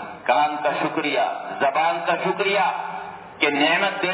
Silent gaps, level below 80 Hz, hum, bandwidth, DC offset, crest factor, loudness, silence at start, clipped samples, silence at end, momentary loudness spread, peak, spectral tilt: none; -70 dBFS; none; 4 kHz; under 0.1%; 18 dB; -21 LUFS; 0 s; under 0.1%; 0 s; 8 LU; -4 dBFS; -7.5 dB/octave